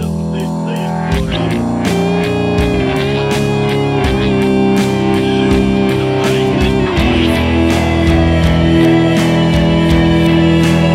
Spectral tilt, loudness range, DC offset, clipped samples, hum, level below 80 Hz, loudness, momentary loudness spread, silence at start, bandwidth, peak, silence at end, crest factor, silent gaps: -6.5 dB/octave; 4 LU; under 0.1%; under 0.1%; none; -24 dBFS; -13 LUFS; 5 LU; 0 s; 14.5 kHz; 0 dBFS; 0 s; 12 dB; none